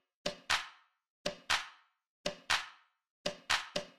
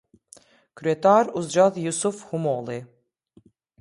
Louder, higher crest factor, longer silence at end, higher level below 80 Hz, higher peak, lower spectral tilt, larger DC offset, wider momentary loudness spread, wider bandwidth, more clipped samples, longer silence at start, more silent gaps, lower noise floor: second, -36 LUFS vs -23 LUFS; about the same, 24 dB vs 20 dB; second, 0.1 s vs 0.95 s; about the same, -66 dBFS vs -70 dBFS; second, -16 dBFS vs -6 dBFS; second, -1 dB/octave vs -5 dB/octave; neither; about the same, 10 LU vs 12 LU; first, 14 kHz vs 11.5 kHz; neither; second, 0.25 s vs 0.75 s; first, 1.10-1.25 s, 2.09-2.24 s, 3.10-3.25 s vs none; about the same, -56 dBFS vs -59 dBFS